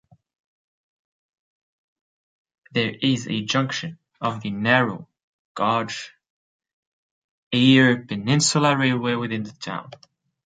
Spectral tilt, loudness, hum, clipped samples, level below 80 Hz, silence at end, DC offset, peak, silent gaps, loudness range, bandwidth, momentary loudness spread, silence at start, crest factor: -4.5 dB/octave; -21 LUFS; none; under 0.1%; -64 dBFS; 0.5 s; under 0.1%; -2 dBFS; 5.23-5.55 s, 6.30-6.60 s, 6.73-7.51 s; 7 LU; 9.4 kHz; 16 LU; 2.75 s; 22 dB